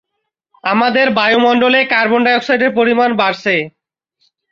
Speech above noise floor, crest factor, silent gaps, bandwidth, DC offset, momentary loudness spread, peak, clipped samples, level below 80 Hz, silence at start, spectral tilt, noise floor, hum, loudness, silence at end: 61 dB; 12 dB; none; 7.2 kHz; under 0.1%; 6 LU; -2 dBFS; under 0.1%; -62 dBFS; 0.65 s; -5.5 dB/octave; -74 dBFS; none; -12 LUFS; 0.8 s